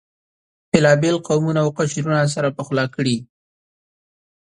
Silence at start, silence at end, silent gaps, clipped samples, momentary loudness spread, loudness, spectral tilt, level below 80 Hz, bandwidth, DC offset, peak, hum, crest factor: 0.75 s; 1.15 s; none; under 0.1%; 7 LU; -19 LUFS; -5.5 dB/octave; -56 dBFS; 11 kHz; under 0.1%; 0 dBFS; none; 20 dB